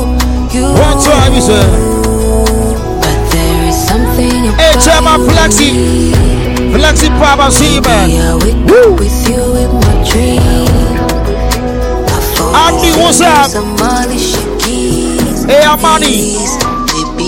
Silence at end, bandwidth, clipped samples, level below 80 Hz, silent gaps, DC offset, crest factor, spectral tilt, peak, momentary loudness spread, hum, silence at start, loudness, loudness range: 0 s; 17 kHz; 0.4%; -14 dBFS; none; under 0.1%; 8 dB; -4.5 dB/octave; 0 dBFS; 7 LU; none; 0 s; -8 LUFS; 2 LU